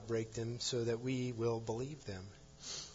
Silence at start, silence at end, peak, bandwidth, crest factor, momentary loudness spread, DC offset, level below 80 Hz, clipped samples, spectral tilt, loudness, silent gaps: 0 s; 0 s; -26 dBFS; 7.4 kHz; 14 dB; 12 LU; under 0.1%; -64 dBFS; under 0.1%; -5.5 dB/octave; -40 LUFS; none